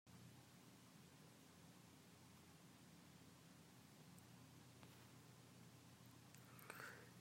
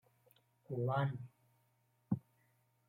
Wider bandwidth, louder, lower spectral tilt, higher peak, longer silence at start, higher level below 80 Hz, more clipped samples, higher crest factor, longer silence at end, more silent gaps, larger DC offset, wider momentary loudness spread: first, 16 kHz vs 14.5 kHz; second, -64 LUFS vs -40 LUFS; second, -4 dB/octave vs -9.5 dB/octave; second, -38 dBFS vs -22 dBFS; second, 0.05 s vs 0.7 s; second, under -90 dBFS vs -76 dBFS; neither; about the same, 26 dB vs 22 dB; second, 0 s vs 0.7 s; neither; neither; second, 7 LU vs 13 LU